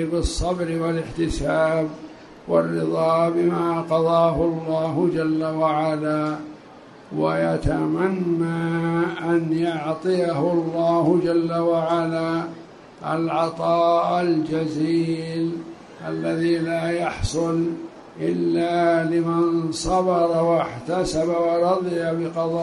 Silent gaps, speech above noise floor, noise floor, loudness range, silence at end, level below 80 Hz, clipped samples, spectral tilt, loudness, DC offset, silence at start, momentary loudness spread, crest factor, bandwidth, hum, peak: none; 23 dB; -44 dBFS; 3 LU; 0 s; -42 dBFS; under 0.1%; -6.5 dB/octave; -22 LUFS; under 0.1%; 0 s; 8 LU; 16 dB; 11.5 kHz; none; -6 dBFS